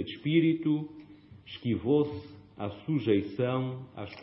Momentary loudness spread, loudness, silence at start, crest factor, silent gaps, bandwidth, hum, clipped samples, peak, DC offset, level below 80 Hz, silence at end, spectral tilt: 17 LU; -30 LUFS; 0 s; 16 dB; none; 5.8 kHz; none; under 0.1%; -14 dBFS; under 0.1%; -66 dBFS; 0 s; -11 dB/octave